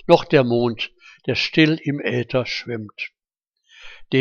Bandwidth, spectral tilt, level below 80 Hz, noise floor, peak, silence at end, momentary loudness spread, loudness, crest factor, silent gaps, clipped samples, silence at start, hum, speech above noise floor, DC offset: 7.2 kHz; -6.5 dB/octave; -54 dBFS; -82 dBFS; 0 dBFS; 0 s; 15 LU; -20 LUFS; 20 dB; none; under 0.1%; 0.05 s; none; 63 dB; under 0.1%